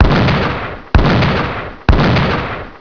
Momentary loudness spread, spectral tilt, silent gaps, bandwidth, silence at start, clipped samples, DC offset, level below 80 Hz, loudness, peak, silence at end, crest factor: 9 LU; -7.5 dB/octave; none; 5.4 kHz; 0 s; under 0.1%; 0.9%; -20 dBFS; -14 LUFS; 0 dBFS; 0.05 s; 12 dB